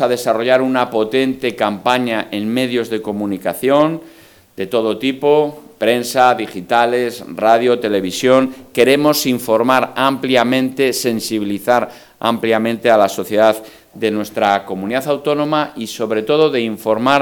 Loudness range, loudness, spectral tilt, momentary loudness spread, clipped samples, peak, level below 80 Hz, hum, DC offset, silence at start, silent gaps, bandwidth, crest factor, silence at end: 3 LU; -16 LUFS; -4.5 dB/octave; 7 LU; under 0.1%; 0 dBFS; -60 dBFS; none; under 0.1%; 0 s; none; 19.5 kHz; 16 dB; 0 s